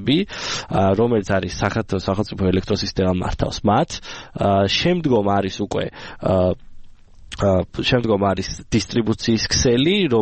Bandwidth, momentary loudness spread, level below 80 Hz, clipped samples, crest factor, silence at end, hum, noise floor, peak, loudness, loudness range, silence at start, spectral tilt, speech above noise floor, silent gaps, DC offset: 8.8 kHz; 8 LU; -38 dBFS; under 0.1%; 16 dB; 0 s; none; -40 dBFS; -4 dBFS; -20 LUFS; 2 LU; 0 s; -5 dB/octave; 21 dB; none; under 0.1%